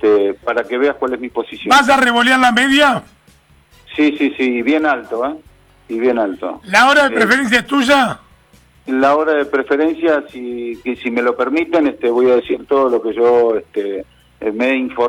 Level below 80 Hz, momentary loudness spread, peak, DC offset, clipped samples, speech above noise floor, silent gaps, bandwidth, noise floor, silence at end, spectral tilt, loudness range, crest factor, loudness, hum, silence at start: -52 dBFS; 13 LU; -2 dBFS; under 0.1%; under 0.1%; 35 dB; none; 19.5 kHz; -50 dBFS; 0 s; -3.5 dB/octave; 4 LU; 14 dB; -14 LUFS; none; 0 s